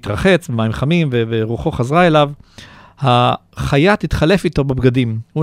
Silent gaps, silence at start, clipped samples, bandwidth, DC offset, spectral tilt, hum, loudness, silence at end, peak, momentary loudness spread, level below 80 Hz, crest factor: none; 0.05 s; under 0.1%; 14.5 kHz; under 0.1%; -7 dB/octave; none; -15 LUFS; 0 s; 0 dBFS; 7 LU; -34 dBFS; 14 dB